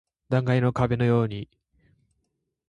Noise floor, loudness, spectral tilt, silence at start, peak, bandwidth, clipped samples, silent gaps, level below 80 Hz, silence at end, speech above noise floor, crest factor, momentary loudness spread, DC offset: -77 dBFS; -24 LUFS; -8.5 dB/octave; 0.3 s; -8 dBFS; 7.4 kHz; under 0.1%; none; -52 dBFS; 1.25 s; 54 dB; 18 dB; 13 LU; under 0.1%